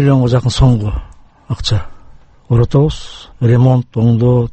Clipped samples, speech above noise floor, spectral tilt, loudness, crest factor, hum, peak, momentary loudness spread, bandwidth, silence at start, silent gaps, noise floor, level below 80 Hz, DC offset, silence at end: under 0.1%; 27 dB; -7.5 dB/octave; -13 LUFS; 12 dB; none; 0 dBFS; 13 LU; 8.6 kHz; 0 s; none; -39 dBFS; -26 dBFS; under 0.1%; 0 s